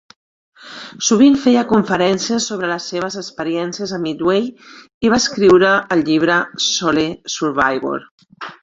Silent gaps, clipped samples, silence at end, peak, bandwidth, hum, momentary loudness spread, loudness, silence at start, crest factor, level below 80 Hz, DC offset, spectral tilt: 4.94-5.01 s, 8.11-8.18 s; under 0.1%; 0.1 s; -2 dBFS; 7.8 kHz; none; 13 LU; -16 LUFS; 0.6 s; 16 dB; -52 dBFS; under 0.1%; -4 dB/octave